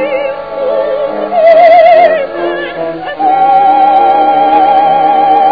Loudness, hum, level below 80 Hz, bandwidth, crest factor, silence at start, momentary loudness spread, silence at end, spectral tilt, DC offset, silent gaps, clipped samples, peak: -8 LUFS; none; -48 dBFS; 5.4 kHz; 8 dB; 0 s; 12 LU; 0 s; -7 dB/octave; 0.7%; none; 2%; 0 dBFS